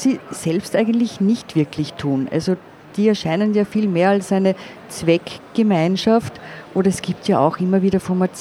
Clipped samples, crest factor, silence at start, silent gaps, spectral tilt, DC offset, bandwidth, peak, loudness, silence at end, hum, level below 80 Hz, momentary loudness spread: under 0.1%; 18 dB; 0 s; none; -6.5 dB/octave; under 0.1%; 13 kHz; -2 dBFS; -19 LUFS; 0 s; none; -54 dBFS; 7 LU